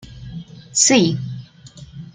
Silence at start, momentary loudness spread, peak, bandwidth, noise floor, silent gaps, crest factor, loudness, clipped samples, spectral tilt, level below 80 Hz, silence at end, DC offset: 0.05 s; 24 LU; -2 dBFS; 10.5 kHz; -41 dBFS; none; 20 dB; -16 LUFS; under 0.1%; -3 dB/octave; -50 dBFS; 0.05 s; under 0.1%